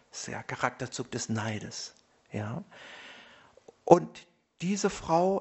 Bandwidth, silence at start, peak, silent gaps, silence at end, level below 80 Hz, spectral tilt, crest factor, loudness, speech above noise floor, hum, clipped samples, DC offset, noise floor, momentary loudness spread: 8.2 kHz; 0.15 s; -2 dBFS; none; 0 s; -62 dBFS; -5 dB/octave; 30 dB; -30 LUFS; 28 dB; none; under 0.1%; under 0.1%; -57 dBFS; 23 LU